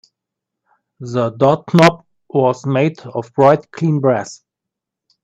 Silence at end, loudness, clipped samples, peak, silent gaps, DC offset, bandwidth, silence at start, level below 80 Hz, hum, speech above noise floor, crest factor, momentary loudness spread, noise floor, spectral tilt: 0.9 s; -15 LUFS; under 0.1%; 0 dBFS; none; under 0.1%; 12.5 kHz; 1 s; -58 dBFS; none; 68 dB; 16 dB; 13 LU; -83 dBFS; -7 dB/octave